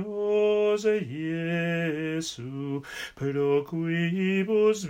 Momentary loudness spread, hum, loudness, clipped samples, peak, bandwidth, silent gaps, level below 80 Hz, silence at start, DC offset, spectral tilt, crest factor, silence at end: 10 LU; none; -27 LUFS; under 0.1%; -12 dBFS; 15.5 kHz; none; -64 dBFS; 0 s; under 0.1%; -6 dB/octave; 14 dB; 0 s